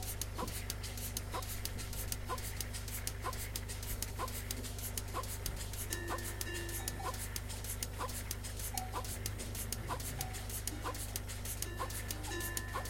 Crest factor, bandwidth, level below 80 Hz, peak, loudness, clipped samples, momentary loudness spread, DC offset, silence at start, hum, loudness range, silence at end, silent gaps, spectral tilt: 24 dB; 17 kHz; -46 dBFS; -16 dBFS; -41 LUFS; under 0.1%; 2 LU; under 0.1%; 0 s; 50 Hz at -45 dBFS; 0 LU; 0 s; none; -3 dB/octave